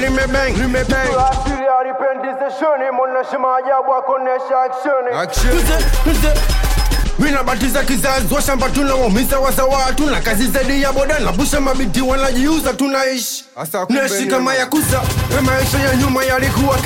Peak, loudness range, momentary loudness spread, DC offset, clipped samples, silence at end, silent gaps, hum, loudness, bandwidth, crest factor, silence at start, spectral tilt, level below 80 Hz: -4 dBFS; 1 LU; 3 LU; under 0.1%; under 0.1%; 0 s; none; none; -16 LUFS; 17 kHz; 10 dB; 0 s; -4.5 dB/octave; -20 dBFS